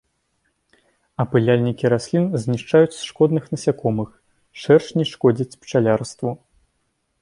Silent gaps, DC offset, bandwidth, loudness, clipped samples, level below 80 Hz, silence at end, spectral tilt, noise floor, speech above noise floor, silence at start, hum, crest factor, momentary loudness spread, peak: none; under 0.1%; 11 kHz; -20 LUFS; under 0.1%; -56 dBFS; 0.85 s; -7 dB/octave; -70 dBFS; 52 dB; 1.2 s; none; 18 dB; 11 LU; -2 dBFS